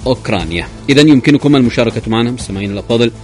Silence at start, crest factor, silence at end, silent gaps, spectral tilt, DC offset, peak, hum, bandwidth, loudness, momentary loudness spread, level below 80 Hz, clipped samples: 0 s; 12 dB; 0 s; none; -6 dB/octave; under 0.1%; 0 dBFS; none; 11 kHz; -12 LUFS; 12 LU; -34 dBFS; 0.3%